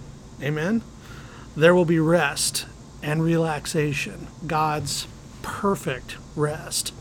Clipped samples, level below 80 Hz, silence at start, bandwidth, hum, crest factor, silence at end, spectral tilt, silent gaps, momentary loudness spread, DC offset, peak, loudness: under 0.1%; -48 dBFS; 0 s; 19 kHz; none; 22 dB; 0 s; -4.5 dB/octave; none; 18 LU; under 0.1%; -2 dBFS; -23 LUFS